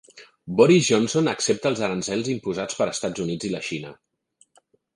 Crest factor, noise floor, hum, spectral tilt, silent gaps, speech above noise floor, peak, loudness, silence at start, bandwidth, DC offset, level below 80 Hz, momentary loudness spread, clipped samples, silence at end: 20 dB; -63 dBFS; none; -4.5 dB/octave; none; 41 dB; -4 dBFS; -22 LUFS; 0.15 s; 11.5 kHz; under 0.1%; -60 dBFS; 13 LU; under 0.1%; 1.05 s